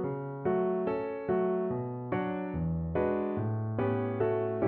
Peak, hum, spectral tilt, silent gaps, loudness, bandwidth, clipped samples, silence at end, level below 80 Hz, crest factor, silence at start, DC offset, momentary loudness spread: -16 dBFS; none; -8.5 dB/octave; none; -32 LUFS; 4.3 kHz; under 0.1%; 0 s; -52 dBFS; 14 dB; 0 s; under 0.1%; 4 LU